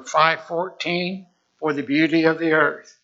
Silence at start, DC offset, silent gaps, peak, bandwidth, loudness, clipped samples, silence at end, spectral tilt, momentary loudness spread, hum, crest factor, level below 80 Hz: 0 s; under 0.1%; none; 0 dBFS; 7.6 kHz; -21 LUFS; under 0.1%; 0.25 s; -5 dB/octave; 10 LU; none; 20 dB; -76 dBFS